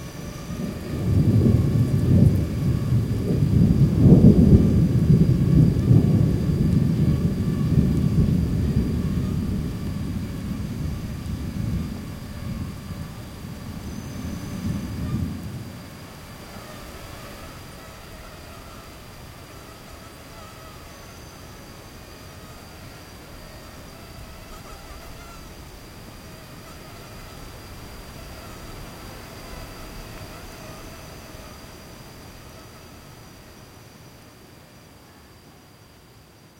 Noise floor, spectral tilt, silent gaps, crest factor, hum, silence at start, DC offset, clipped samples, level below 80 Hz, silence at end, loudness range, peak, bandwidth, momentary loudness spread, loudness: -49 dBFS; -8 dB/octave; none; 22 dB; none; 0 s; under 0.1%; under 0.1%; -36 dBFS; 2.5 s; 24 LU; -2 dBFS; 16.5 kHz; 24 LU; -21 LUFS